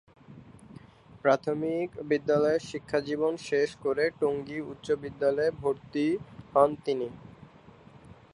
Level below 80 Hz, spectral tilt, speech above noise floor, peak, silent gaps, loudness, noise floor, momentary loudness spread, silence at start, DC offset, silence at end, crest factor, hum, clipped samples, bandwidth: -62 dBFS; -6 dB/octave; 25 dB; -8 dBFS; none; -29 LUFS; -53 dBFS; 8 LU; 0.3 s; under 0.1%; 0.2 s; 22 dB; none; under 0.1%; 10.5 kHz